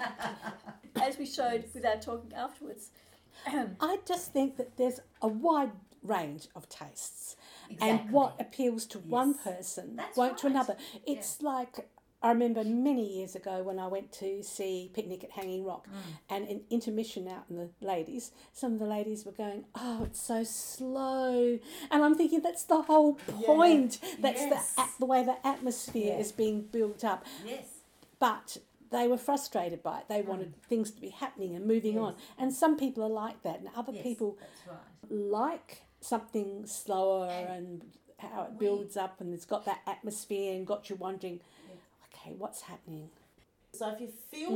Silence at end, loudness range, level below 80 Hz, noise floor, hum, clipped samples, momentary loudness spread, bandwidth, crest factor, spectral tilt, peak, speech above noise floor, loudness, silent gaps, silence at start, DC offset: 0 s; 11 LU; -66 dBFS; -67 dBFS; none; under 0.1%; 16 LU; 19 kHz; 22 dB; -4.5 dB/octave; -12 dBFS; 35 dB; -33 LUFS; none; 0 s; under 0.1%